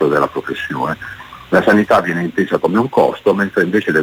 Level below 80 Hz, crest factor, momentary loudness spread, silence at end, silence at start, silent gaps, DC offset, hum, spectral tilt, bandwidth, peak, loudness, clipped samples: -50 dBFS; 14 dB; 10 LU; 0 s; 0 s; none; under 0.1%; none; -6.5 dB/octave; 19.5 kHz; -2 dBFS; -15 LUFS; under 0.1%